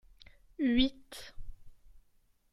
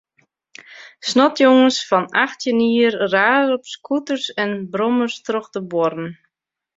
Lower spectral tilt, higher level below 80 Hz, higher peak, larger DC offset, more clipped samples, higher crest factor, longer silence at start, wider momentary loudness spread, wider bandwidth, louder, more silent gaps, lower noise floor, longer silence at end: about the same, -4.5 dB/octave vs -4 dB/octave; first, -50 dBFS vs -66 dBFS; second, -14 dBFS vs -2 dBFS; neither; neither; about the same, 22 dB vs 18 dB; about the same, 0.6 s vs 0.7 s; first, 23 LU vs 11 LU; first, 14 kHz vs 7.8 kHz; second, -31 LUFS vs -18 LUFS; neither; second, -68 dBFS vs -80 dBFS; about the same, 0.55 s vs 0.65 s